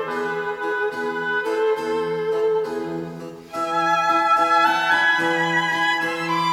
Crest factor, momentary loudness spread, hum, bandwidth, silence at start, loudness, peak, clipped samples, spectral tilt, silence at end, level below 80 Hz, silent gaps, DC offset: 14 dB; 11 LU; none; 16.5 kHz; 0 s; -20 LUFS; -6 dBFS; under 0.1%; -4 dB/octave; 0 s; -66 dBFS; none; under 0.1%